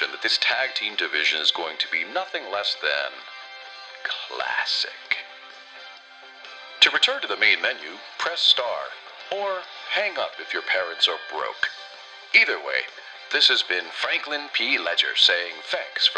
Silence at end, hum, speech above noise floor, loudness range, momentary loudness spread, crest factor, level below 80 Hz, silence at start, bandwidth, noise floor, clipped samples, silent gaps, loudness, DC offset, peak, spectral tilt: 0 s; none; 21 dB; 6 LU; 21 LU; 24 dB; -80 dBFS; 0 s; 11 kHz; -45 dBFS; under 0.1%; none; -22 LUFS; under 0.1%; -2 dBFS; 0.5 dB/octave